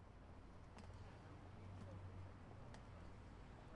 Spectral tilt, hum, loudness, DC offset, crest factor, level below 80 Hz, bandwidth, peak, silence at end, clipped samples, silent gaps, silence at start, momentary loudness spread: -7 dB/octave; none; -59 LUFS; under 0.1%; 16 dB; -66 dBFS; 10.5 kHz; -42 dBFS; 0 s; under 0.1%; none; 0 s; 5 LU